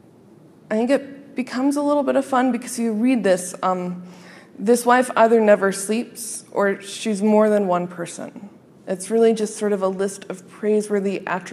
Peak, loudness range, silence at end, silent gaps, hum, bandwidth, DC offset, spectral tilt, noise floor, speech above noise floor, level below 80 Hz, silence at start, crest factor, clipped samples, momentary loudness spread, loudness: -2 dBFS; 4 LU; 0 s; none; none; 14.5 kHz; under 0.1%; -5 dB/octave; -48 dBFS; 28 dB; -76 dBFS; 0.7 s; 18 dB; under 0.1%; 14 LU; -20 LUFS